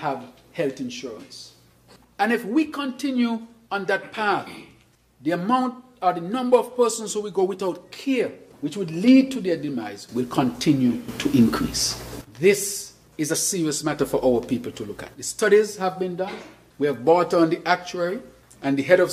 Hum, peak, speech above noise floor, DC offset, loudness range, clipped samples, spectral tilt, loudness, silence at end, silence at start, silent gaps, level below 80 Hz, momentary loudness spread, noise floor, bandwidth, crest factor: none; -2 dBFS; 34 dB; under 0.1%; 4 LU; under 0.1%; -4.5 dB/octave; -23 LUFS; 0 s; 0 s; none; -54 dBFS; 14 LU; -57 dBFS; 15.5 kHz; 20 dB